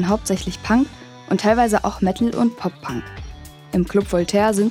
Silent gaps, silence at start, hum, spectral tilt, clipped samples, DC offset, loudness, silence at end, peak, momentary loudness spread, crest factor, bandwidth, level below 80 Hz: none; 0 s; none; -5.5 dB/octave; under 0.1%; under 0.1%; -20 LUFS; 0 s; -2 dBFS; 17 LU; 16 dB; 15.5 kHz; -40 dBFS